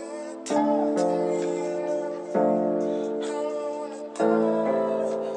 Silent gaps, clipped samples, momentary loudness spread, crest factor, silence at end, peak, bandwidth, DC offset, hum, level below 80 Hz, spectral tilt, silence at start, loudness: none; under 0.1%; 8 LU; 16 dB; 0 s; -8 dBFS; 10.5 kHz; under 0.1%; none; -76 dBFS; -6 dB/octave; 0 s; -26 LUFS